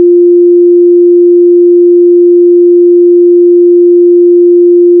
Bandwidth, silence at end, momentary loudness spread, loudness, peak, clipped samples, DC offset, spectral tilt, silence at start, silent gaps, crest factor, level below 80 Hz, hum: 0.4 kHz; 0 s; 0 LU; -4 LUFS; 0 dBFS; under 0.1%; under 0.1%; -17 dB/octave; 0 s; none; 4 dB; under -90 dBFS; none